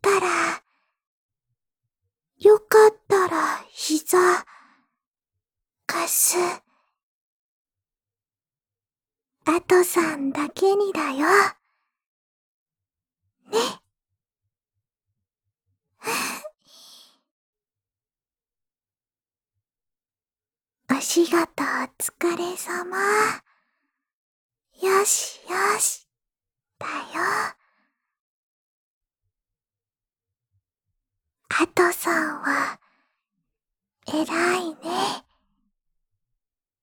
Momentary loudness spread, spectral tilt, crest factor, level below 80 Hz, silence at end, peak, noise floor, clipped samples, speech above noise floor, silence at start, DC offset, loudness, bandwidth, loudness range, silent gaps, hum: 12 LU; -2 dB/octave; 24 dB; -72 dBFS; 1.6 s; -2 dBFS; under -90 dBFS; under 0.1%; over 68 dB; 0.05 s; under 0.1%; -22 LUFS; over 20 kHz; 13 LU; 1.07-1.29 s, 5.07-5.11 s, 7.03-7.65 s, 12.06-12.66 s, 17.31-17.53 s, 24.13-24.49 s, 28.20-29.01 s; none